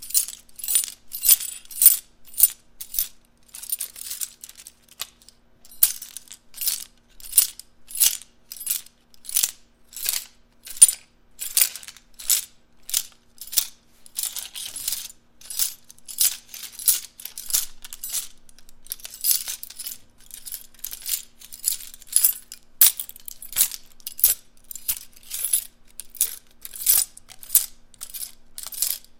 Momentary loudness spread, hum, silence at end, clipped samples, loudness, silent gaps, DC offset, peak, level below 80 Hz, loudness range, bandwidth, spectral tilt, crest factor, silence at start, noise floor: 23 LU; none; 0 s; under 0.1%; -21 LUFS; none; under 0.1%; 0 dBFS; -56 dBFS; 7 LU; 17 kHz; 3.5 dB/octave; 26 dB; 0 s; -54 dBFS